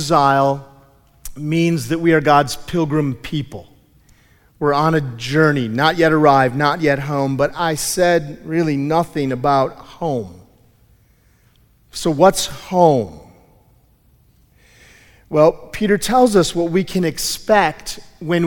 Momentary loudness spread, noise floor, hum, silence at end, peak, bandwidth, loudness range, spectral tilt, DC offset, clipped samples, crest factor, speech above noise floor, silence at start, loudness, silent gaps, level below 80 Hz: 13 LU; -54 dBFS; none; 0 s; 0 dBFS; 18 kHz; 5 LU; -5 dB/octave; under 0.1%; under 0.1%; 18 dB; 38 dB; 0 s; -17 LUFS; none; -44 dBFS